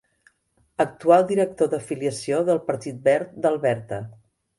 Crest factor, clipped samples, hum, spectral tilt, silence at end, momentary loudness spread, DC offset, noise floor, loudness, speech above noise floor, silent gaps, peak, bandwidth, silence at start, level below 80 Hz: 20 dB; under 0.1%; none; -6 dB/octave; 0.45 s; 13 LU; under 0.1%; -66 dBFS; -22 LUFS; 44 dB; none; -4 dBFS; 11.5 kHz; 0.8 s; -64 dBFS